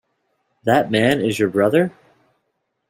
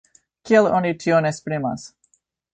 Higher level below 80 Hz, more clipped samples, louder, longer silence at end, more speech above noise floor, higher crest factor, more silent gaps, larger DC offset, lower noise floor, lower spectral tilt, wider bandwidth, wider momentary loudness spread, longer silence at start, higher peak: about the same, -58 dBFS vs -60 dBFS; neither; about the same, -18 LUFS vs -20 LUFS; first, 1 s vs 0.65 s; first, 56 dB vs 46 dB; about the same, 18 dB vs 18 dB; neither; neither; first, -73 dBFS vs -65 dBFS; about the same, -6 dB/octave vs -6 dB/octave; first, 16 kHz vs 9.2 kHz; second, 6 LU vs 11 LU; first, 0.65 s vs 0.45 s; about the same, -2 dBFS vs -4 dBFS